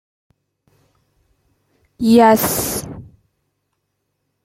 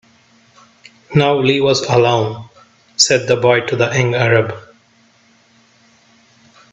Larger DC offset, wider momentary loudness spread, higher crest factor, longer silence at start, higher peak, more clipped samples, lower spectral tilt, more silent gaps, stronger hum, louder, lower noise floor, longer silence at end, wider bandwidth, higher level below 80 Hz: neither; first, 22 LU vs 11 LU; about the same, 18 dB vs 18 dB; first, 2 s vs 1.1 s; about the same, -2 dBFS vs 0 dBFS; neither; about the same, -4.5 dB/octave vs -4 dB/octave; neither; neither; about the same, -15 LUFS vs -14 LUFS; first, -72 dBFS vs -53 dBFS; second, 1.45 s vs 2.15 s; first, 16.5 kHz vs 8.4 kHz; about the same, -50 dBFS vs -54 dBFS